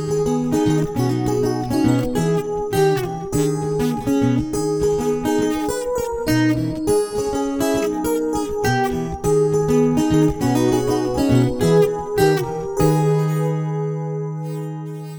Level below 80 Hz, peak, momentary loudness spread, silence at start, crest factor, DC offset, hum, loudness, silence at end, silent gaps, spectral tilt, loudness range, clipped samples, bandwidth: -40 dBFS; -4 dBFS; 6 LU; 0 s; 14 dB; under 0.1%; none; -19 LUFS; 0 s; none; -6.5 dB/octave; 3 LU; under 0.1%; over 20 kHz